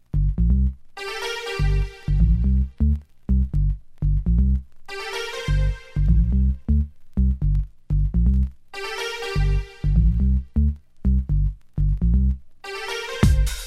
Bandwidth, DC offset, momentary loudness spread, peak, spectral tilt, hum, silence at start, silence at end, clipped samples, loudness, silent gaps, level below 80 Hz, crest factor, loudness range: 12.5 kHz; under 0.1%; 9 LU; -2 dBFS; -6.5 dB/octave; none; 0.15 s; 0 s; under 0.1%; -23 LUFS; none; -22 dBFS; 18 dB; 1 LU